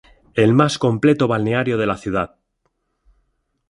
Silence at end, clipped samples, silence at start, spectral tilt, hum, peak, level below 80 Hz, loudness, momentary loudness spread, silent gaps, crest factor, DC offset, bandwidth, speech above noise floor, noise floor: 1.45 s; under 0.1%; 0.35 s; -6.5 dB/octave; none; -2 dBFS; -50 dBFS; -18 LUFS; 9 LU; none; 18 dB; under 0.1%; 11.5 kHz; 53 dB; -70 dBFS